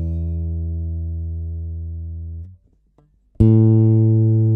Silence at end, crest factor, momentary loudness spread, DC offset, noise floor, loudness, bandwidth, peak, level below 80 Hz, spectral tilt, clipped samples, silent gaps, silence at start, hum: 0 s; 18 dB; 17 LU; under 0.1%; -57 dBFS; -18 LUFS; 1.2 kHz; 0 dBFS; -32 dBFS; -13.5 dB/octave; under 0.1%; none; 0 s; none